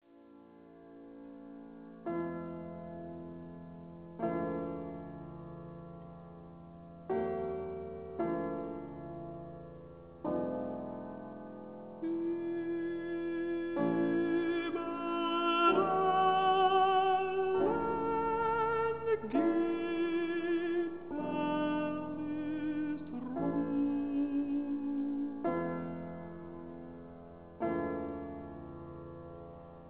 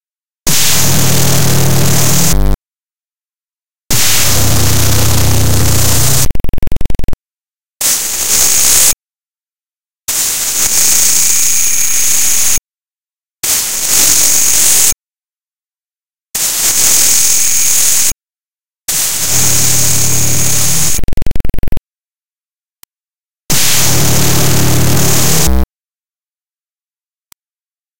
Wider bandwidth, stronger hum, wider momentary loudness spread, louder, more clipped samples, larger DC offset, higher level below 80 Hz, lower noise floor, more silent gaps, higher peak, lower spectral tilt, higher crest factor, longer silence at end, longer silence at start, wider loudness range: second, 4 kHz vs over 20 kHz; neither; first, 20 LU vs 15 LU; second, -34 LUFS vs -9 LUFS; second, under 0.1% vs 0.2%; second, under 0.1% vs 10%; second, -62 dBFS vs -24 dBFS; second, -58 dBFS vs under -90 dBFS; neither; second, -16 dBFS vs 0 dBFS; first, -4.5 dB/octave vs -2 dB/octave; first, 18 dB vs 12 dB; about the same, 0 s vs 0 s; about the same, 0 s vs 0 s; first, 12 LU vs 5 LU